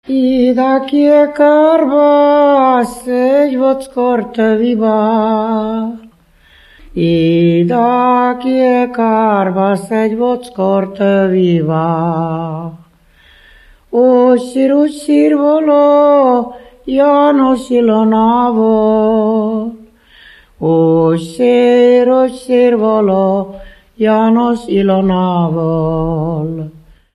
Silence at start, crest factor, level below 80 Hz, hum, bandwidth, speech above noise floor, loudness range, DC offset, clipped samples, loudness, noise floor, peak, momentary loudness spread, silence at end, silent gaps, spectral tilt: 0.1 s; 12 dB; -44 dBFS; none; 12 kHz; 36 dB; 4 LU; under 0.1%; under 0.1%; -11 LUFS; -47 dBFS; 0 dBFS; 9 LU; 0.45 s; none; -8 dB/octave